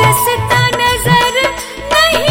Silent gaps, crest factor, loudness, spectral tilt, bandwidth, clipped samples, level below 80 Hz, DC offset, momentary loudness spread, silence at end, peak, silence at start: none; 12 dB; -11 LUFS; -3.5 dB/octave; 17 kHz; under 0.1%; -32 dBFS; under 0.1%; 5 LU; 0 s; 0 dBFS; 0 s